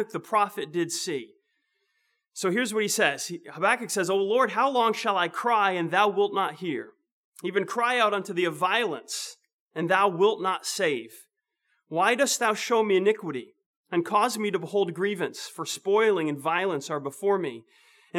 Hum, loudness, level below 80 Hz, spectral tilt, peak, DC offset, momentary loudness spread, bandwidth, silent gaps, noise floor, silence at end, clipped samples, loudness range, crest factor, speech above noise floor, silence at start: none; -26 LUFS; under -90 dBFS; -3.5 dB/octave; -6 dBFS; under 0.1%; 11 LU; 17 kHz; 7.12-7.32 s, 9.53-9.71 s, 13.66-13.84 s; -76 dBFS; 0 s; under 0.1%; 3 LU; 20 dB; 50 dB; 0 s